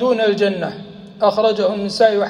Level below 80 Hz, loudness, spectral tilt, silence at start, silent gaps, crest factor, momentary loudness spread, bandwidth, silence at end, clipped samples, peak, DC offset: -58 dBFS; -17 LUFS; -5.5 dB/octave; 0 s; none; 16 dB; 13 LU; 11 kHz; 0 s; under 0.1%; -2 dBFS; under 0.1%